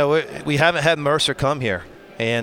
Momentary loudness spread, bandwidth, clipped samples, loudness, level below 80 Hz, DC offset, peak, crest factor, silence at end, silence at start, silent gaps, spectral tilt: 9 LU; 17 kHz; under 0.1%; -20 LUFS; -48 dBFS; under 0.1%; -2 dBFS; 18 dB; 0 s; 0 s; none; -4.5 dB/octave